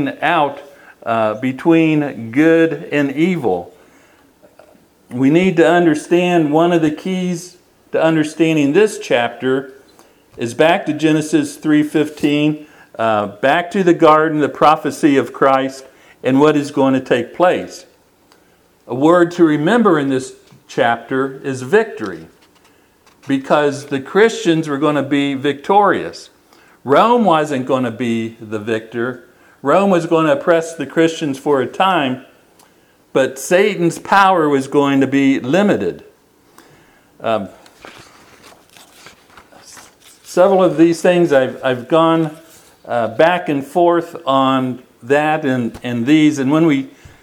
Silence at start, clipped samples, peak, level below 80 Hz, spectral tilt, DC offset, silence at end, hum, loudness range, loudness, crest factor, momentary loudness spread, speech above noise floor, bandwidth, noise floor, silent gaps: 0 s; under 0.1%; 0 dBFS; -60 dBFS; -6 dB/octave; under 0.1%; 0.35 s; none; 4 LU; -15 LUFS; 16 dB; 11 LU; 38 dB; 14.5 kHz; -53 dBFS; none